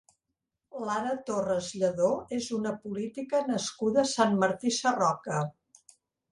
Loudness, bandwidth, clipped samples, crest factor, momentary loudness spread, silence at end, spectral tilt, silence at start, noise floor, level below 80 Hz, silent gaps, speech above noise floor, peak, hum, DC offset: -29 LUFS; 11.5 kHz; under 0.1%; 20 dB; 10 LU; 0.8 s; -4.5 dB/octave; 0.75 s; -85 dBFS; -68 dBFS; none; 56 dB; -8 dBFS; none; under 0.1%